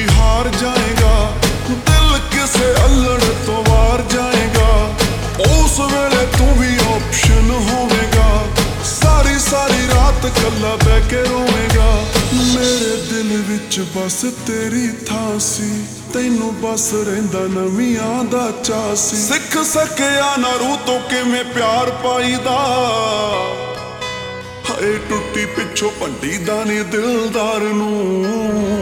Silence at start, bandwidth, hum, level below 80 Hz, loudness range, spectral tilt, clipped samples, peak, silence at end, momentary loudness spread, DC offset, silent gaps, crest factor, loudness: 0 s; 19.5 kHz; none; -20 dBFS; 5 LU; -4 dB/octave; under 0.1%; 0 dBFS; 0 s; 7 LU; under 0.1%; none; 14 dB; -15 LUFS